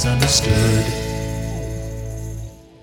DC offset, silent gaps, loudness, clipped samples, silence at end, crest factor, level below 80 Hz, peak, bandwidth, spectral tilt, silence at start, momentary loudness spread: under 0.1%; none; -20 LUFS; under 0.1%; 0.2 s; 18 dB; -30 dBFS; -2 dBFS; 18 kHz; -4 dB/octave; 0 s; 16 LU